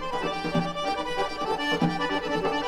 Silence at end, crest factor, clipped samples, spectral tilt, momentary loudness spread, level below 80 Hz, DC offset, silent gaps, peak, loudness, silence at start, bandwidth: 0 s; 16 dB; under 0.1%; -5 dB/octave; 4 LU; -48 dBFS; 0.4%; none; -12 dBFS; -27 LUFS; 0 s; 14.5 kHz